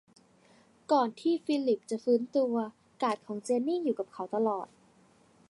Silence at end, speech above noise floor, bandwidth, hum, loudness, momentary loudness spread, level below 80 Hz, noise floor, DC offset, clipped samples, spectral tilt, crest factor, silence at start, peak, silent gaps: 0.85 s; 33 dB; 11.5 kHz; none; -31 LUFS; 8 LU; -82 dBFS; -63 dBFS; under 0.1%; under 0.1%; -5.5 dB/octave; 18 dB; 0.9 s; -12 dBFS; none